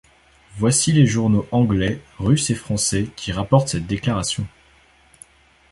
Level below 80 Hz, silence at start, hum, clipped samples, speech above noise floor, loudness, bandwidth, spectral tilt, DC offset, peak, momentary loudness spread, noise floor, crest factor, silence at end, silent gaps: -42 dBFS; 0.55 s; none; under 0.1%; 35 dB; -20 LUFS; 11.5 kHz; -5 dB/octave; under 0.1%; -2 dBFS; 9 LU; -54 dBFS; 18 dB; 1.25 s; none